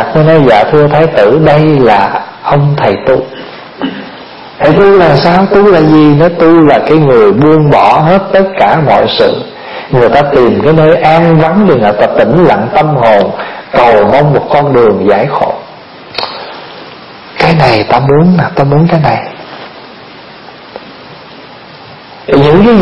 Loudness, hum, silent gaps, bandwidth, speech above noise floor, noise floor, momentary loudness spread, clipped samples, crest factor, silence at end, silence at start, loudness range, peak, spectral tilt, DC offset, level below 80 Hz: -6 LUFS; none; none; 7 kHz; 25 dB; -30 dBFS; 19 LU; 2%; 6 dB; 0 s; 0 s; 6 LU; 0 dBFS; -8.5 dB/octave; under 0.1%; -36 dBFS